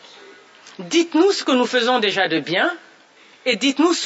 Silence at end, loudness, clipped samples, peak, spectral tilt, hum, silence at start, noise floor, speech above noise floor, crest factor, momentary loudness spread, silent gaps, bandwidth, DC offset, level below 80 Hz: 0 s; -18 LUFS; under 0.1%; -4 dBFS; -3 dB/octave; none; 0.3 s; -50 dBFS; 32 dB; 16 dB; 7 LU; none; 8 kHz; under 0.1%; -76 dBFS